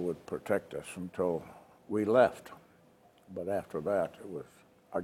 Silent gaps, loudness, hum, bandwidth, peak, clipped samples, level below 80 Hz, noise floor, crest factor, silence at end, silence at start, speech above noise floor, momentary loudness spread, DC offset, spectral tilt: none; -33 LUFS; none; 15.5 kHz; -12 dBFS; under 0.1%; -72 dBFS; -63 dBFS; 22 dB; 0 s; 0 s; 30 dB; 20 LU; under 0.1%; -6.5 dB/octave